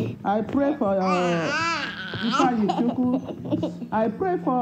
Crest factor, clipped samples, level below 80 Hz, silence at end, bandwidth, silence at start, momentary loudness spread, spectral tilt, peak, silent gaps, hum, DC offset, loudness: 16 dB; under 0.1%; -58 dBFS; 0 s; 8.8 kHz; 0 s; 6 LU; -6 dB/octave; -8 dBFS; none; none; under 0.1%; -24 LUFS